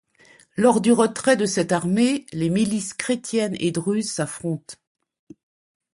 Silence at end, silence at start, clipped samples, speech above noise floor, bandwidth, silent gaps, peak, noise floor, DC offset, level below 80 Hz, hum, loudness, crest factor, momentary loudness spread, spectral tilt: 1.2 s; 0.55 s; under 0.1%; 33 dB; 11.5 kHz; none; -4 dBFS; -54 dBFS; under 0.1%; -60 dBFS; none; -22 LUFS; 18 dB; 10 LU; -5 dB/octave